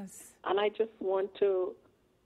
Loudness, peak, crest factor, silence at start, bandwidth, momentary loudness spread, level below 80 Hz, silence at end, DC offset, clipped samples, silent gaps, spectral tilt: -32 LUFS; -18 dBFS; 16 dB; 0 s; 13.5 kHz; 10 LU; -76 dBFS; 0.55 s; under 0.1%; under 0.1%; none; -4.5 dB/octave